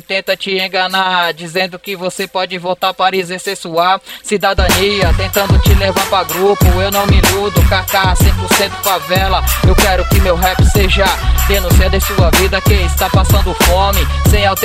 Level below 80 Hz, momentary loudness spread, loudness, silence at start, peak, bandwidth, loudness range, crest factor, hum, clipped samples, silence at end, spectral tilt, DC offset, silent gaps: -16 dBFS; 7 LU; -12 LUFS; 0.1 s; 0 dBFS; 16.5 kHz; 4 LU; 12 dB; none; under 0.1%; 0 s; -4.5 dB/octave; under 0.1%; none